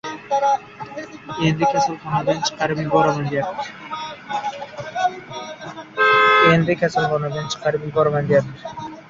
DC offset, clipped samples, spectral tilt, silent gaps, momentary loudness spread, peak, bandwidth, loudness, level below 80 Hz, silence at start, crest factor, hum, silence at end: under 0.1%; under 0.1%; -5 dB/octave; none; 18 LU; -2 dBFS; 7.8 kHz; -19 LUFS; -54 dBFS; 0.05 s; 18 dB; none; 0.05 s